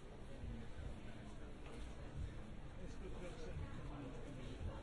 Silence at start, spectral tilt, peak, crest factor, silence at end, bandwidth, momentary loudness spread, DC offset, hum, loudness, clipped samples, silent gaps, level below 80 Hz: 0 s; -6.5 dB/octave; -36 dBFS; 12 dB; 0 s; 11.5 kHz; 5 LU; under 0.1%; none; -53 LUFS; under 0.1%; none; -52 dBFS